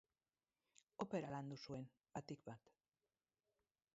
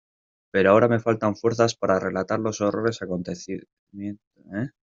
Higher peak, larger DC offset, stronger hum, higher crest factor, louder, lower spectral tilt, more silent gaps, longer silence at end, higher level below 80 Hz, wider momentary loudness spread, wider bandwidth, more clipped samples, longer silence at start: second, -32 dBFS vs -4 dBFS; neither; neither; about the same, 22 dB vs 20 dB; second, -51 LUFS vs -23 LUFS; about the same, -6 dB/octave vs -6 dB/octave; second, none vs 3.73-3.87 s, 4.27-4.31 s; first, 1.35 s vs 0.25 s; second, -84 dBFS vs -62 dBFS; second, 13 LU vs 17 LU; about the same, 7.6 kHz vs 7.8 kHz; neither; first, 1 s vs 0.55 s